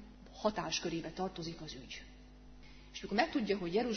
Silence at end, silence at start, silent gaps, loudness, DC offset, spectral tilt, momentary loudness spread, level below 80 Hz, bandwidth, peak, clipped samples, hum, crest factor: 0 s; 0 s; none; -37 LUFS; under 0.1%; -3.5 dB/octave; 23 LU; -58 dBFS; 6.4 kHz; -14 dBFS; under 0.1%; none; 24 dB